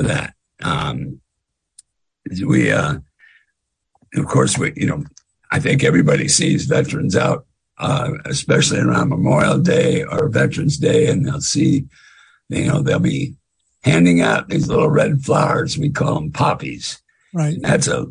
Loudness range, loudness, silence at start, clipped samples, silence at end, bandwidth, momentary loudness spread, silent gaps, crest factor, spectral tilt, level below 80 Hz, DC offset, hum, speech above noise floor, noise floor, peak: 5 LU; -17 LUFS; 0 s; under 0.1%; 0 s; 10.5 kHz; 12 LU; none; 16 dB; -5 dB/octave; -46 dBFS; under 0.1%; none; 60 dB; -76 dBFS; -2 dBFS